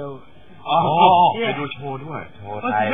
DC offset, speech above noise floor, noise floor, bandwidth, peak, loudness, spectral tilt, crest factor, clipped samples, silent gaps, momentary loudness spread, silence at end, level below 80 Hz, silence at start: 0.8%; 27 dB; -45 dBFS; 3.8 kHz; 0 dBFS; -18 LUFS; -9 dB/octave; 18 dB; under 0.1%; none; 20 LU; 0 s; -62 dBFS; 0 s